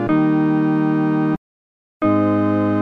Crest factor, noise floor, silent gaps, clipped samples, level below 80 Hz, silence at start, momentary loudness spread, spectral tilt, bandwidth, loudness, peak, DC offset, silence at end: 12 dB; under -90 dBFS; 1.38-2.00 s; under 0.1%; -52 dBFS; 0 s; 6 LU; -10 dB/octave; 4.6 kHz; -18 LUFS; -6 dBFS; under 0.1%; 0 s